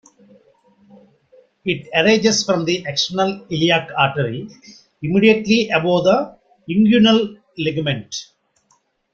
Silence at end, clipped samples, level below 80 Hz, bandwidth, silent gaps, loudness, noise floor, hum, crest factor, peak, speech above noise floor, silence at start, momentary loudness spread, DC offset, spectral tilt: 0.9 s; under 0.1%; -56 dBFS; 7.8 kHz; none; -17 LUFS; -62 dBFS; none; 18 dB; -2 dBFS; 45 dB; 1.65 s; 14 LU; under 0.1%; -4.5 dB/octave